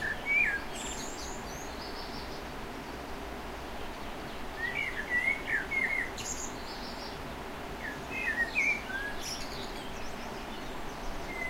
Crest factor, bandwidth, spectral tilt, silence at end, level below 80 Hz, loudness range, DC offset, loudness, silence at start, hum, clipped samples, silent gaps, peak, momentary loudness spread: 18 dB; 16 kHz; -2.5 dB/octave; 0 s; -48 dBFS; 7 LU; under 0.1%; -34 LUFS; 0 s; none; under 0.1%; none; -18 dBFS; 13 LU